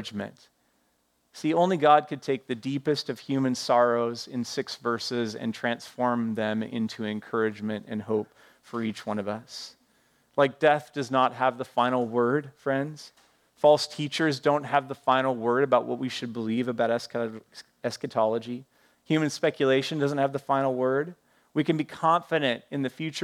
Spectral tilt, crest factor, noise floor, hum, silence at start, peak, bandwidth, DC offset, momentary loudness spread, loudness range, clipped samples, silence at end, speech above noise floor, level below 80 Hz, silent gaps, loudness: -5.5 dB/octave; 20 dB; -71 dBFS; none; 0 s; -6 dBFS; 14.5 kHz; under 0.1%; 11 LU; 5 LU; under 0.1%; 0 s; 44 dB; -78 dBFS; none; -27 LUFS